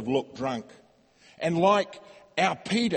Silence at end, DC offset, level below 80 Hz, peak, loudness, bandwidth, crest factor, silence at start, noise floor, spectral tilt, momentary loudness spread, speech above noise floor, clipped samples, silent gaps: 0 s; under 0.1%; -66 dBFS; -8 dBFS; -27 LUFS; 8.8 kHz; 20 dB; 0 s; -59 dBFS; -5 dB/octave; 14 LU; 32 dB; under 0.1%; none